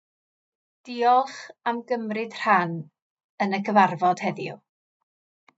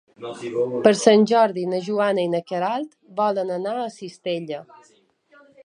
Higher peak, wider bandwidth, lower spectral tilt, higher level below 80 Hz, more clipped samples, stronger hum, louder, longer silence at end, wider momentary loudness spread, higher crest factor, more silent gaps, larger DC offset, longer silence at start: about the same, -4 dBFS vs -2 dBFS; second, 8 kHz vs 10.5 kHz; about the same, -6 dB/octave vs -5 dB/octave; second, under -90 dBFS vs -72 dBFS; neither; neither; second, -24 LUFS vs -21 LUFS; about the same, 1 s vs 1 s; about the same, 14 LU vs 16 LU; about the same, 22 dB vs 22 dB; first, 3.02-3.16 s, 3.24-3.38 s vs none; neither; first, 0.85 s vs 0.2 s